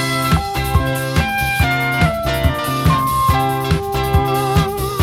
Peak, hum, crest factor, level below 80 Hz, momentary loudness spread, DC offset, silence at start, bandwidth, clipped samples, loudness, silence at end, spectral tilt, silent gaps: -2 dBFS; none; 14 dB; -26 dBFS; 3 LU; under 0.1%; 0 s; 17 kHz; under 0.1%; -17 LUFS; 0 s; -5.5 dB/octave; none